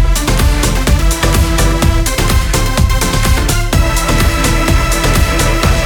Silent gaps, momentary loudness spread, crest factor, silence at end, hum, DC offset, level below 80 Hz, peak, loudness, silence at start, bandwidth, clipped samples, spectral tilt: none; 1 LU; 10 dB; 0 s; none; under 0.1%; -14 dBFS; 0 dBFS; -12 LUFS; 0 s; 19 kHz; under 0.1%; -4 dB/octave